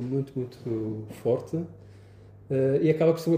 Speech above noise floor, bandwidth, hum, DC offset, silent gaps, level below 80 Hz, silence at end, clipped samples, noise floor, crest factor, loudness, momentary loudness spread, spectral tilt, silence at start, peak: 24 dB; 15.5 kHz; none; under 0.1%; none; -62 dBFS; 0 s; under 0.1%; -50 dBFS; 16 dB; -28 LUFS; 12 LU; -8.5 dB/octave; 0 s; -10 dBFS